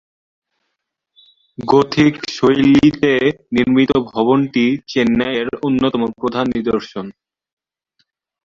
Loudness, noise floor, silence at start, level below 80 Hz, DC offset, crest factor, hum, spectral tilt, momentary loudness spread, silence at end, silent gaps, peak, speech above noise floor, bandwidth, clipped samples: -15 LUFS; -75 dBFS; 1.6 s; -48 dBFS; under 0.1%; 16 dB; none; -6.5 dB/octave; 8 LU; 1.35 s; none; -2 dBFS; 60 dB; 7.4 kHz; under 0.1%